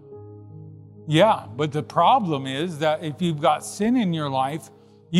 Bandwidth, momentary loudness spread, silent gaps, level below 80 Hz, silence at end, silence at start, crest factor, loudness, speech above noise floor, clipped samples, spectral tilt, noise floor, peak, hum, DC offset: 13 kHz; 24 LU; none; -66 dBFS; 0 s; 0.05 s; 18 dB; -22 LUFS; 21 dB; under 0.1%; -6 dB/octave; -42 dBFS; -4 dBFS; none; under 0.1%